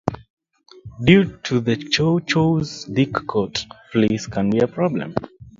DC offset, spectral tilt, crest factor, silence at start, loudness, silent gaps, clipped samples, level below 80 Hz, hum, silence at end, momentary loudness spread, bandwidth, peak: under 0.1%; -6 dB/octave; 20 dB; 0.05 s; -20 LUFS; 0.30-0.37 s; under 0.1%; -48 dBFS; none; 0.1 s; 10 LU; 7.6 kHz; 0 dBFS